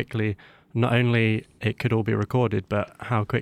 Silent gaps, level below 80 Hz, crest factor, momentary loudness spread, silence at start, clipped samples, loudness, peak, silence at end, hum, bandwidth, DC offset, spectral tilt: none; -56 dBFS; 16 dB; 8 LU; 0 s; under 0.1%; -25 LUFS; -8 dBFS; 0 s; none; 10 kHz; under 0.1%; -8 dB/octave